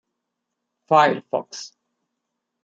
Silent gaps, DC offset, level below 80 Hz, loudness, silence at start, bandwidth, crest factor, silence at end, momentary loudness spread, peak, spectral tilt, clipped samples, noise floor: none; under 0.1%; -76 dBFS; -20 LUFS; 0.9 s; 7.8 kHz; 22 dB; 0.95 s; 19 LU; -2 dBFS; -4.5 dB/octave; under 0.1%; -80 dBFS